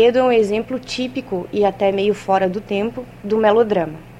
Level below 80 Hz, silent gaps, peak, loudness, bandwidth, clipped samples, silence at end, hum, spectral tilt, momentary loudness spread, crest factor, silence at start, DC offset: -48 dBFS; none; -4 dBFS; -18 LUFS; 12 kHz; under 0.1%; 0 s; none; -6 dB/octave; 10 LU; 14 dB; 0 s; under 0.1%